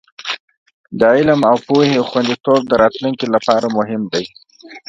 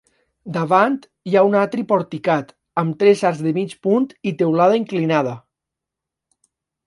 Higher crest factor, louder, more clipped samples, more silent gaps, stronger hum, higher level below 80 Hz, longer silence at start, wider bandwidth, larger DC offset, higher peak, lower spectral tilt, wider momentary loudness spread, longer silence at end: about the same, 16 dB vs 18 dB; first, -15 LUFS vs -18 LUFS; neither; first, 0.40-0.48 s, 0.57-0.66 s, 0.74-0.84 s vs none; neither; first, -52 dBFS vs -68 dBFS; second, 0.2 s vs 0.45 s; second, 9 kHz vs 11.5 kHz; neither; about the same, 0 dBFS vs 0 dBFS; about the same, -6 dB/octave vs -7 dB/octave; about the same, 12 LU vs 10 LU; second, 0.1 s vs 1.45 s